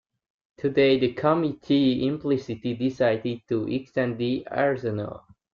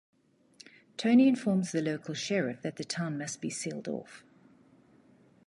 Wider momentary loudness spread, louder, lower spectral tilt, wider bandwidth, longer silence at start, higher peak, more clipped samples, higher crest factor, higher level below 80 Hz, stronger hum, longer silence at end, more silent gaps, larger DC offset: second, 9 LU vs 15 LU; first, -25 LUFS vs -30 LUFS; first, -8 dB/octave vs -5 dB/octave; second, 7 kHz vs 11.5 kHz; second, 0.6 s vs 1 s; first, -8 dBFS vs -14 dBFS; neither; about the same, 16 dB vs 18 dB; first, -60 dBFS vs -78 dBFS; neither; second, 0.35 s vs 1.25 s; neither; neither